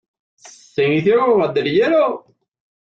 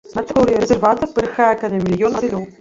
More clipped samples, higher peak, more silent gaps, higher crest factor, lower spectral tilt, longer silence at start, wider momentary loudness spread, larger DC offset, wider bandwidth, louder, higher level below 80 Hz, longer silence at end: neither; about the same, -4 dBFS vs -2 dBFS; neither; about the same, 14 dB vs 14 dB; about the same, -6.5 dB/octave vs -6.5 dB/octave; first, 0.45 s vs 0.05 s; first, 8 LU vs 5 LU; neither; about the same, 8 kHz vs 7.8 kHz; about the same, -16 LUFS vs -17 LUFS; second, -60 dBFS vs -42 dBFS; first, 0.65 s vs 0.1 s